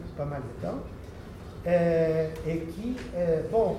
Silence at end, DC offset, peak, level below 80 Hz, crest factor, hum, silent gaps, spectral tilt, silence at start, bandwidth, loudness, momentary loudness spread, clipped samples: 0 s; under 0.1%; -12 dBFS; -46 dBFS; 16 dB; none; none; -8 dB/octave; 0 s; 14 kHz; -29 LUFS; 18 LU; under 0.1%